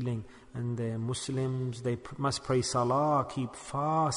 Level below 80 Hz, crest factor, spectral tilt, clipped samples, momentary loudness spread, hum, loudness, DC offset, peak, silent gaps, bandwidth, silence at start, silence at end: -60 dBFS; 14 dB; -5.5 dB/octave; under 0.1%; 9 LU; none; -32 LUFS; under 0.1%; -16 dBFS; none; 11 kHz; 0 s; 0 s